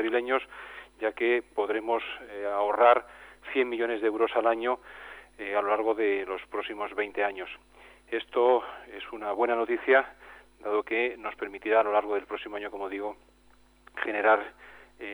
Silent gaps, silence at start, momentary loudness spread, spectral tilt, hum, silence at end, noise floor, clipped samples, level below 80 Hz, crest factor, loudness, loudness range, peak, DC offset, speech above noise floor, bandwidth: none; 0 s; 17 LU; -4.5 dB/octave; none; 0 s; -60 dBFS; under 0.1%; -64 dBFS; 20 dB; -28 LUFS; 4 LU; -8 dBFS; under 0.1%; 31 dB; over 20 kHz